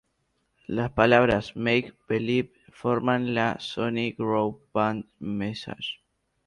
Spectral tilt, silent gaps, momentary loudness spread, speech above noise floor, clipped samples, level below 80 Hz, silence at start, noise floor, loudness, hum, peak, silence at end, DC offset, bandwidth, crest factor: -7 dB/octave; none; 14 LU; 48 dB; under 0.1%; -54 dBFS; 0.7 s; -74 dBFS; -26 LUFS; none; -6 dBFS; 0.55 s; under 0.1%; 11 kHz; 20 dB